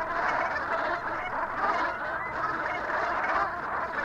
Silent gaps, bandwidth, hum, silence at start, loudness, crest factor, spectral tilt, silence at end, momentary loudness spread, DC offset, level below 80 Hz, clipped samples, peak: none; 15 kHz; none; 0 s; -29 LUFS; 16 dB; -4.5 dB/octave; 0 s; 4 LU; under 0.1%; -54 dBFS; under 0.1%; -14 dBFS